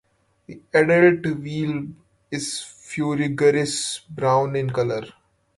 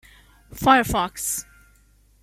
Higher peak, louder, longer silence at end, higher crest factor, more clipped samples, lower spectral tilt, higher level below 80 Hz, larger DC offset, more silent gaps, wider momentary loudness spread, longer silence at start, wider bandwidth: about the same, -4 dBFS vs -4 dBFS; about the same, -21 LUFS vs -21 LUFS; second, 0.45 s vs 0.8 s; about the same, 18 dB vs 20 dB; neither; first, -5 dB/octave vs -3 dB/octave; second, -60 dBFS vs -44 dBFS; neither; neither; first, 15 LU vs 9 LU; about the same, 0.5 s vs 0.5 s; second, 11.5 kHz vs 16.5 kHz